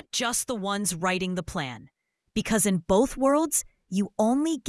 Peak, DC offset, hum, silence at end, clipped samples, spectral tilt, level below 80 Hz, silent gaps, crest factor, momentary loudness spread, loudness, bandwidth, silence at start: -8 dBFS; under 0.1%; none; 0 s; under 0.1%; -4 dB/octave; -50 dBFS; none; 18 dB; 10 LU; -26 LUFS; 12 kHz; 0.15 s